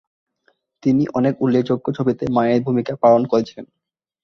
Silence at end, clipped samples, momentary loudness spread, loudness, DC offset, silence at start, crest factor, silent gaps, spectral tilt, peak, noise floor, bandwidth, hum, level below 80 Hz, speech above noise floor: 0.6 s; under 0.1%; 7 LU; -18 LUFS; under 0.1%; 0.85 s; 16 dB; none; -8.5 dB/octave; -2 dBFS; -64 dBFS; 6.4 kHz; none; -54 dBFS; 47 dB